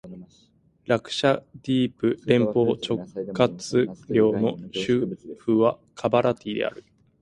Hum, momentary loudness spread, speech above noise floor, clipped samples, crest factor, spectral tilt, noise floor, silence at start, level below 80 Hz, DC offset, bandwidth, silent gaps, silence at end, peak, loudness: none; 8 LU; 37 dB; under 0.1%; 20 dB; -6 dB/octave; -61 dBFS; 0.05 s; -60 dBFS; under 0.1%; 11.5 kHz; none; 0.4 s; -4 dBFS; -24 LUFS